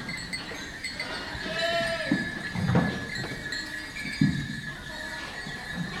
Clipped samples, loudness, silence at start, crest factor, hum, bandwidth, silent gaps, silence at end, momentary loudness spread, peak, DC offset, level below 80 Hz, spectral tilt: under 0.1%; -30 LUFS; 0 s; 22 dB; none; 16 kHz; none; 0 s; 9 LU; -8 dBFS; under 0.1%; -50 dBFS; -5 dB/octave